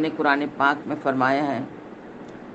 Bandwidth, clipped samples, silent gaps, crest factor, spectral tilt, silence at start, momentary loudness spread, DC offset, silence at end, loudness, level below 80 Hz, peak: 8.2 kHz; under 0.1%; none; 20 dB; -6.5 dB/octave; 0 s; 19 LU; under 0.1%; 0 s; -23 LUFS; -66 dBFS; -4 dBFS